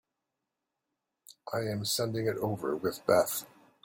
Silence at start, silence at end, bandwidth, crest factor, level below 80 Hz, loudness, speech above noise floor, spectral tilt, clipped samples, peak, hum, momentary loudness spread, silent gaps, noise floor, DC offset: 1.3 s; 0.4 s; 16.5 kHz; 22 dB; -68 dBFS; -31 LUFS; 56 dB; -4.5 dB/octave; under 0.1%; -12 dBFS; none; 10 LU; none; -86 dBFS; under 0.1%